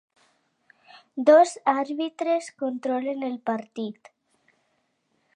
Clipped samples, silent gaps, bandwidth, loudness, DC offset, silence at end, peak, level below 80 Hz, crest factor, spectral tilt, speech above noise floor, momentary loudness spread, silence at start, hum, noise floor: under 0.1%; none; 10.5 kHz; -24 LUFS; under 0.1%; 1.45 s; -4 dBFS; -86 dBFS; 22 dB; -4.5 dB/octave; 49 dB; 17 LU; 1.15 s; none; -72 dBFS